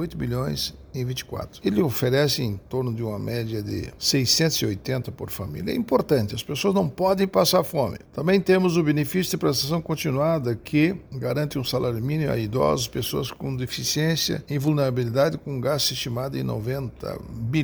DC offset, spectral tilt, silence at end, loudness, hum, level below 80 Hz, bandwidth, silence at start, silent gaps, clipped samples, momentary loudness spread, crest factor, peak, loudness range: under 0.1%; -5 dB/octave; 0 s; -24 LUFS; none; -48 dBFS; over 20 kHz; 0 s; none; under 0.1%; 10 LU; 18 dB; -6 dBFS; 3 LU